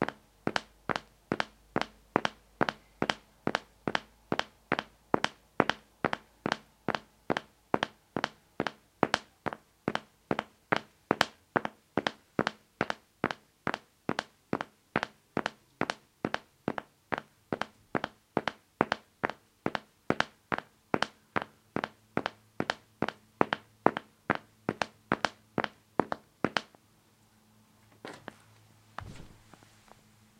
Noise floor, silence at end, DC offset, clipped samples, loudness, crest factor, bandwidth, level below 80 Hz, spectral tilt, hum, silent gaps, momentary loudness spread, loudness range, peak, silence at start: -65 dBFS; 1.1 s; under 0.1%; under 0.1%; -35 LUFS; 36 dB; 16.5 kHz; -66 dBFS; -4.5 dB/octave; none; none; 8 LU; 3 LU; 0 dBFS; 0 s